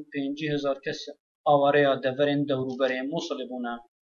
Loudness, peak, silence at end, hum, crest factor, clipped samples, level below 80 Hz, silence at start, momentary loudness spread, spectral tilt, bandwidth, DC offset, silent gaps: -26 LUFS; -8 dBFS; 0.2 s; none; 18 dB; under 0.1%; -74 dBFS; 0 s; 13 LU; -6 dB/octave; 7.2 kHz; under 0.1%; 1.20-1.44 s